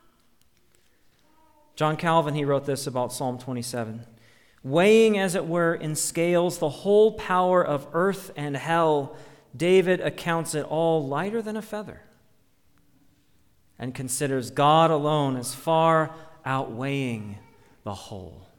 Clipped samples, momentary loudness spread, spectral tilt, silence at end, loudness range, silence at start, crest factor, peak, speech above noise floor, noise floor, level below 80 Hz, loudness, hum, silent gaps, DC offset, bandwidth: under 0.1%; 16 LU; -5 dB/octave; 0.15 s; 7 LU; 1.75 s; 18 dB; -6 dBFS; 41 dB; -65 dBFS; -62 dBFS; -24 LUFS; none; none; under 0.1%; 19 kHz